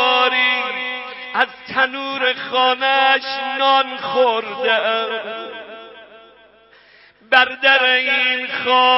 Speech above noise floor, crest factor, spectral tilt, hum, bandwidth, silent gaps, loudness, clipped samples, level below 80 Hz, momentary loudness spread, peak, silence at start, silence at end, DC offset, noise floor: 32 dB; 18 dB; -4 dB/octave; none; 5.8 kHz; none; -16 LUFS; under 0.1%; -66 dBFS; 12 LU; 0 dBFS; 0 s; 0 s; under 0.1%; -49 dBFS